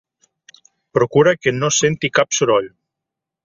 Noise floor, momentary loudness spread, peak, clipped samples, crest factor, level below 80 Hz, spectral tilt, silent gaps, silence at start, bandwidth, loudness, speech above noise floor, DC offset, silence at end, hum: -83 dBFS; 5 LU; -2 dBFS; under 0.1%; 18 dB; -56 dBFS; -3.5 dB/octave; none; 0.95 s; 7.8 kHz; -16 LUFS; 67 dB; under 0.1%; 0.75 s; none